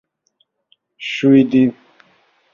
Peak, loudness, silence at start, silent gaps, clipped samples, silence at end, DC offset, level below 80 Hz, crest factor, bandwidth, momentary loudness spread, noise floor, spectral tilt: -2 dBFS; -14 LUFS; 1 s; none; under 0.1%; 0.8 s; under 0.1%; -60 dBFS; 16 dB; 7 kHz; 14 LU; -65 dBFS; -7 dB/octave